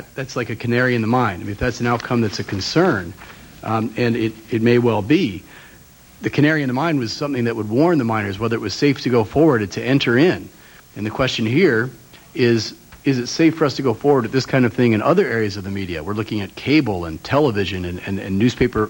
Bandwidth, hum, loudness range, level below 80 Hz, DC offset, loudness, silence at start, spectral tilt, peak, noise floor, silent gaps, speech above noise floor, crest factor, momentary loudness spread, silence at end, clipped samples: 16.5 kHz; none; 3 LU; -46 dBFS; under 0.1%; -19 LUFS; 0 s; -6.5 dB/octave; -2 dBFS; -46 dBFS; none; 27 dB; 16 dB; 10 LU; 0 s; under 0.1%